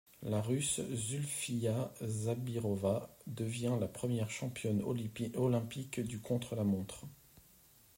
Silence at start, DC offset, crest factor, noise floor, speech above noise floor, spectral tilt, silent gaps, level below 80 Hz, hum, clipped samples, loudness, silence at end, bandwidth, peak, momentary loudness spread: 0.2 s; under 0.1%; 16 dB; -64 dBFS; 28 dB; -5.5 dB/octave; none; -68 dBFS; none; under 0.1%; -37 LUFS; 0.6 s; 16 kHz; -20 dBFS; 6 LU